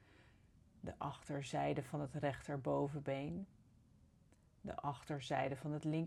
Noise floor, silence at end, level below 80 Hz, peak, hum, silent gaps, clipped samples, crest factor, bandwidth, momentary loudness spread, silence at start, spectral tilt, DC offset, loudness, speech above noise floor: -70 dBFS; 0 s; -68 dBFS; -26 dBFS; none; none; under 0.1%; 18 dB; 12.5 kHz; 10 LU; 0.2 s; -6.5 dB/octave; under 0.1%; -43 LUFS; 28 dB